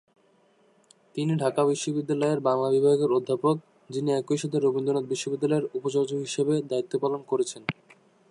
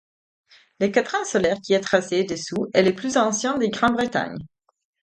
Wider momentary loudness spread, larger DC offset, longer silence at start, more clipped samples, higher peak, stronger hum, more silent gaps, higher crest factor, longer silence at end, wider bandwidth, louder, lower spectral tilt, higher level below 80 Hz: about the same, 8 LU vs 6 LU; neither; first, 1.15 s vs 0.8 s; neither; second, -10 dBFS vs -2 dBFS; neither; neither; about the same, 16 dB vs 20 dB; about the same, 0.6 s vs 0.55 s; about the same, 11.5 kHz vs 10.5 kHz; second, -26 LUFS vs -22 LUFS; first, -6 dB/octave vs -4 dB/octave; second, -76 dBFS vs -58 dBFS